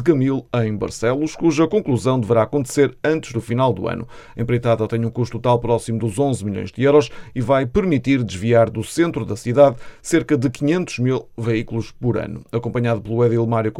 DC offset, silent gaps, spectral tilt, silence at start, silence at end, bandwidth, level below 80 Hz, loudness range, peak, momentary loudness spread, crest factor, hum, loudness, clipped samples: under 0.1%; none; -7 dB/octave; 0 s; 0 s; 13 kHz; -44 dBFS; 3 LU; -2 dBFS; 8 LU; 18 dB; none; -19 LUFS; under 0.1%